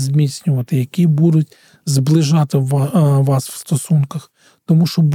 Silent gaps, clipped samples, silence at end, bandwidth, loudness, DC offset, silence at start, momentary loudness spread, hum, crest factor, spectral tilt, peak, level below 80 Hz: none; under 0.1%; 0 s; 15.5 kHz; -15 LUFS; under 0.1%; 0 s; 8 LU; none; 12 dB; -7 dB/octave; -2 dBFS; -62 dBFS